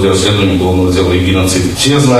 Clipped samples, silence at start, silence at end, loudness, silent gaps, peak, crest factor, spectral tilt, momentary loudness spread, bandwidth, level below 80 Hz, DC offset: under 0.1%; 0 s; 0 s; -10 LUFS; none; 0 dBFS; 10 dB; -5 dB/octave; 1 LU; 15 kHz; -30 dBFS; under 0.1%